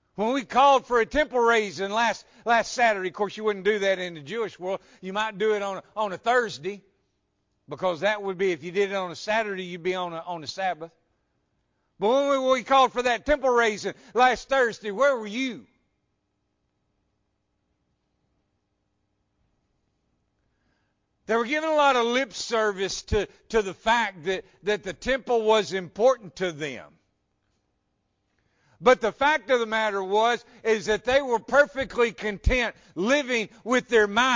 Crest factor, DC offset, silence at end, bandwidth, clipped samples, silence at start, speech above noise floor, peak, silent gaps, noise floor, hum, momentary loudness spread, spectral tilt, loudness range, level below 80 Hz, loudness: 18 dB; under 0.1%; 0 s; 7.6 kHz; under 0.1%; 0.15 s; 51 dB; -8 dBFS; none; -76 dBFS; none; 10 LU; -4 dB/octave; 6 LU; -46 dBFS; -25 LUFS